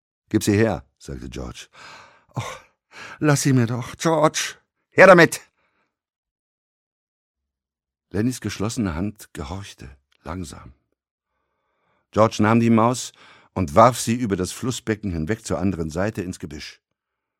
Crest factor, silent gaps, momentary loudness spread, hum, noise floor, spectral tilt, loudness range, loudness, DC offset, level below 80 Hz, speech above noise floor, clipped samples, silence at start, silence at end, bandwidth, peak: 22 dB; 6.16-6.23 s, 6.31-7.34 s, 11.11-11.18 s; 20 LU; none; -89 dBFS; -5.5 dB/octave; 13 LU; -20 LUFS; under 0.1%; -48 dBFS; 69 dB; under 0.1%; 0.35 s; 0.7 s; 16.5 kHz; 0 dBFS